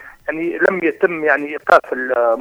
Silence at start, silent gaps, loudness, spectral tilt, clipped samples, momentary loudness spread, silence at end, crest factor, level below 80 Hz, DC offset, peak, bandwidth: 0 s; none; -17 LUFS; -6 dB/octave; under 0.1%; 8 LU; 0 s; 16 dB; -56 dBFS; under 0.1%; 0 dBFS; 15 kHz